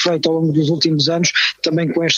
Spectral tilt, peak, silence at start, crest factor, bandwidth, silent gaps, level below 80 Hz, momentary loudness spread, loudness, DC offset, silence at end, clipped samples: -4 dB/octave; -2 dBFS; 0 s; 14 dB; 7.6 kHz; none; -60 dBFS; 3 LU; -16 LUFS; under 0.1%; 0 s; under 0.1%